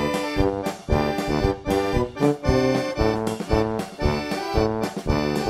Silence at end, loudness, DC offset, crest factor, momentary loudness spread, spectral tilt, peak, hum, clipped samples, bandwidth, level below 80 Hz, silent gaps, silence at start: 0 s; -23 LUFS; under 0.1%; 18 dB; 5 LU; -6 dB/octave; -4 dBFS; none; under 0.1%; 16 kHz; -32 dBFS; none; 0 s